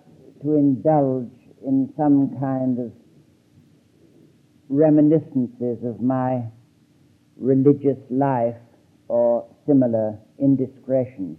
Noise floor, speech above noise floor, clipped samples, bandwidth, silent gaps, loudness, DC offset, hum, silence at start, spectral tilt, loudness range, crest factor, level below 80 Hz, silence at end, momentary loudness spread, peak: -57 dBFS; 37 dB; under 0.1%; 3 kHz; none; -21 LUFS; under 0.1%; none; 0.4 s; -12 dB/octave; 3 LU; 18 dB; -70 dBFS; 0.05 s; 11 LU; -4 dBFS